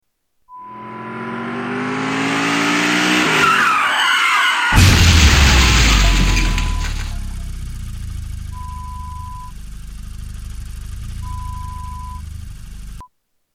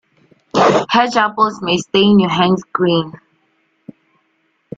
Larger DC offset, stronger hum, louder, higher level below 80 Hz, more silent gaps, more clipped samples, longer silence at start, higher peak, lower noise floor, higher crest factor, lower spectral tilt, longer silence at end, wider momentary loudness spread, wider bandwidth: neither; neither; about the same, -14 LUFS vs -14 LUFS; first, -22 dBFS vs -56 dBFS; neither; neither; about the same, 0.5 s vs 0.55 s; about the same, 0 dBFS vs 0 dBFS; about the same, -60 dBFS vs -63 dBFS; about the same, 16 dB vs 16 dB; second, -3.5 dB/octave vs -5.5 dB/octave; second, 0.5 s vs 1.65 s; first, 23 LU vs 7 LU; first, 16.5 kHz vs 7.8 kHz